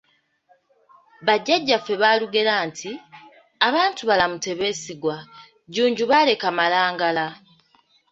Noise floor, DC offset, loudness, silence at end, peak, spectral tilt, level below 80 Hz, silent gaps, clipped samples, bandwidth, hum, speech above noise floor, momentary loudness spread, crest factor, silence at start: -62 dBFS; under 0.1%; -21 LUFS; 0.75 s; -2 dBFS; -3 dB/octave; -64 dBFS; none; under 0.1%; 8 kHz; none; 41 dB; 12 LU; 20 dB; 1.2 s